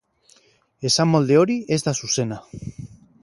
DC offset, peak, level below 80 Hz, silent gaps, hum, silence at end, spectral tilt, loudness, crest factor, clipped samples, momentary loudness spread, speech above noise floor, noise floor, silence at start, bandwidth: under 0.1%; -4 dBFS; -54 dBFS; none; none; 0.3 s; -4.5 dB/octave; -20 LUFS; 18 dB; under 0.1%; 20 LU; 38 dB; -58 dBFS; 0.8 s; 11.5 kHz